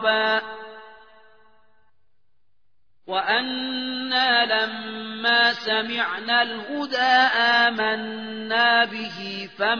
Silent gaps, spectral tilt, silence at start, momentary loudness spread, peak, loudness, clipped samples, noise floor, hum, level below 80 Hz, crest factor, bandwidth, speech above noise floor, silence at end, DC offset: none; -3.5 dB/octave; 0 s; 14 LU; -4 dBFS; -21 LUFS; under 0.1%; -76 dBFS; none; -72 dBFS; 20 dB; 5.4 kHz; 54 dB; 0 s; 0.2%